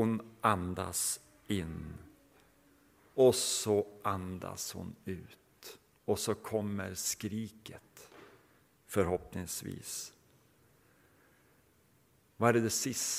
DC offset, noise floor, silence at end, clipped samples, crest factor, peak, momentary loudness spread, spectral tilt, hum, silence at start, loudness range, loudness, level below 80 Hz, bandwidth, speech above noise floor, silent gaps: under 0.1%; -68 dBFS; 0 s; under 0.1%; 26 dB; -10 dBFS; 23 LU; -4 dB/octave; none; 0 s; 7 LU; -34 LUFS; -62 dBFS; 16.5 kHz; 35 dB; none